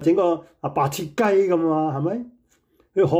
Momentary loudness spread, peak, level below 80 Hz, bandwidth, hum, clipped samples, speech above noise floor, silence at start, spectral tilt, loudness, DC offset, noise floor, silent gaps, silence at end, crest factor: 9 LU; -8 dBFS; -62 dBFS; 16.5 kHz; none; under 0.1%; 41 dB; 0 s; -7 dB/octave; -22 LUFS; under 0.1%; -62 dBFS; none; 0 s; 14 dB